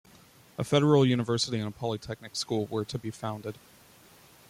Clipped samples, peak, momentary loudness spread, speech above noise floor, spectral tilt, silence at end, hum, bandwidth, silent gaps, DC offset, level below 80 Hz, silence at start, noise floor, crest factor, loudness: under 0.1%; -10 dBFS; 16 LU; 28 dB; -5.5 dB/octave; 0.95 s; none; 16 kHz; none; under 0.1%; -64 dBFS; 0.6 s; -56 dBFS; 18 dB; -29 LUFS